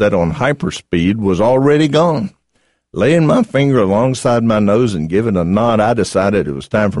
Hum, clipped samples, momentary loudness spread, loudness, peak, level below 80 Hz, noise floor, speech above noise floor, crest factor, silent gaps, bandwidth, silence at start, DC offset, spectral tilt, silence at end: none; under 0.1%; 6 LU; -14 LUFS; -2 dBFS; -40 dBFS; -62 dBFS; 49 dB; 12 dB; none; 11.5 kHz; 0 s; 0.4%; -6.5 dB/octave; 0 s